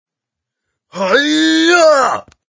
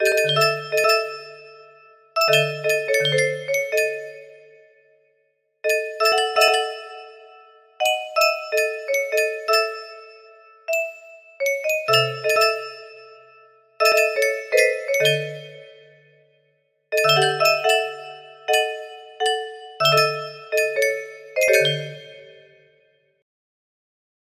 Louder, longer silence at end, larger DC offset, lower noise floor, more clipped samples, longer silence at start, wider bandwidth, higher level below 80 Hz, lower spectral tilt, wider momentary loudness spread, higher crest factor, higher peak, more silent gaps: first, -11 LUFS vs -20 LUFS; second, 0.4 s vs 1.95 s; neither; first, -82 dBFS vs -68 dBFS; neither; first, 0.95 s vs 0 s; second, 7.6 kHz vs 15.5 kHz; first, -60 dBFS vs -72 dBFS; about the same, -2.5 dB/octave vs -2 dB/octave; second, 11 LU vs 18 LU; second, 14 dB vs 20 dB; about the same, 0 dBFS vs -2 dBFS; neither